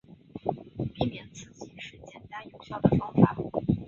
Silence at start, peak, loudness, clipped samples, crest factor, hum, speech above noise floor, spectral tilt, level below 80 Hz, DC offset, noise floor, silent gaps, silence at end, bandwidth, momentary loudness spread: 0.35 s; -4 dBFS; -28 LUFS; under 0.1%; 26 dB; none; 21 dB; -8 dB/octave; -50 dBFS; under 0.1%; -46 dBFS; none; 0 s; 7.4 kHz; 21 LU